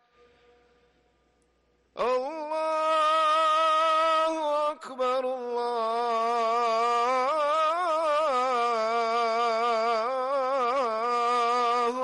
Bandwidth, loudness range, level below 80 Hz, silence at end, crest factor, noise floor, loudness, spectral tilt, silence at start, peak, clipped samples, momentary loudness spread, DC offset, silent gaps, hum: 11.5 kHz; 2 LU; -72 dBFS; 0 s; 8 dB; -68 dBFS; -26 LUFS; -2 dB/octave; 1.95 s; -18 dBFS; under 0.1%; 7 LU; under 0.1%; none; none